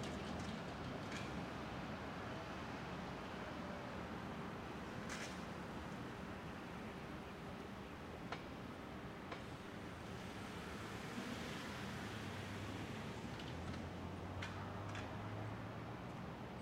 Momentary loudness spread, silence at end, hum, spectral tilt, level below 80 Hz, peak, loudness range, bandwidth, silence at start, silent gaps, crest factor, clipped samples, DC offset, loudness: 4 LU; 0 s; none; -5.5 dB/octave; -62 dBFS; -30 dBFS; 3 LU; 16 kHz; 0 s; none; 18 dB; under 0.1%; under 0.1%; -48 LUFS